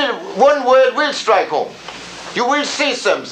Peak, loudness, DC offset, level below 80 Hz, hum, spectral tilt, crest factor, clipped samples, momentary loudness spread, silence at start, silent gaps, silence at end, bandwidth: -2 dBFS; -15 LUFS; under 0.1%; -60 dBFS; none; -2.5 dB/octave; 14 dB; under 0.1%; 15 LU; 0 s; none; 0 s; 9.8 kHz